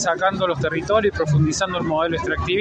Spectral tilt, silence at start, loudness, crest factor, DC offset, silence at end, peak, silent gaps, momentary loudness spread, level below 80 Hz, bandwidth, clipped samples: -5 dB/octave; 0 s; -20 LUFS; 14 dB; under 0.1%; 0 s; -6 dBFS; none; 3 LU; -40 dBFS; 8.8 kHz; under 0.1%